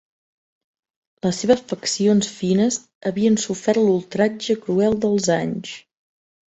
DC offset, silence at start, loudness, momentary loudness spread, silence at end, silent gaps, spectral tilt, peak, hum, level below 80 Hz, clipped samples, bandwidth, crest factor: under 0.1%; 1.25 s; -20 LUFS; 8 LU; 0.7 s; 2.95-3.01 s; -5 dB/octave; -4 dBFS; none; -56 dBFS; under 0.1%; 8.2 kHz; 18 dB